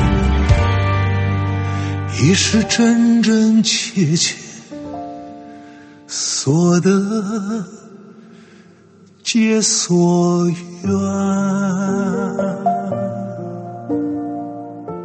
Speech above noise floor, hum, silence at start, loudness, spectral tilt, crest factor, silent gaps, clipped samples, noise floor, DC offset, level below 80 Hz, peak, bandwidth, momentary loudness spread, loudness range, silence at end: 31 dB; none; 0 s; -17 LUFS; -5 dB/octave; 16 dB; none; under 0.1%; -47 dBFS; under 0.1%; -30 dBFS; 0 dBFS; 8.8 kHz; 16 LU; 5 LU; 0 s